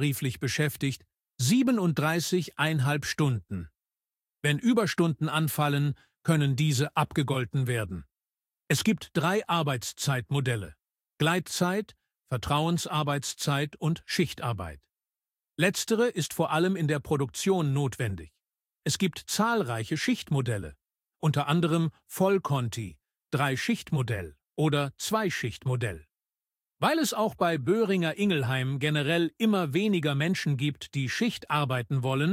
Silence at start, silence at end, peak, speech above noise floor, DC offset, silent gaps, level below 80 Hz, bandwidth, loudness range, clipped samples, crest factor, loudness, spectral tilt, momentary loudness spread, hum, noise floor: 0 s; 0 s; -8 dBFS; over 63 dB; under 0.1%; none; -58 dBFS; 16.5 kHz; 3 LU; under 0.1%; 20 dB; -28 LUFS; -5 dB/octave; 8 LU; none; under -90 dBFS